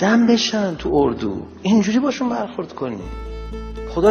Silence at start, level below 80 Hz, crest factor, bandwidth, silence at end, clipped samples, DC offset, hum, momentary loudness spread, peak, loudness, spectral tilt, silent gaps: 0 s; -36 dBFS; 18 dB; 6.8 kHz; 0 s; under 0.1%; under 0.1%; none; 16 LU; -2 dBFS; -19 LUFS; -5.5 dB/octave; none